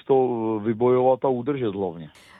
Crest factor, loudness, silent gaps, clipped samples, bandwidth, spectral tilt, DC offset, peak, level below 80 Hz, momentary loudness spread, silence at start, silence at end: 14 dB; -23 LUFS; none; under 0.1%; 4.5 kHz; -9.5 dB/octave; under 0.1%; -8 dBFS; -66 dBFS; 10 LU; 0.1 s; 0.3 s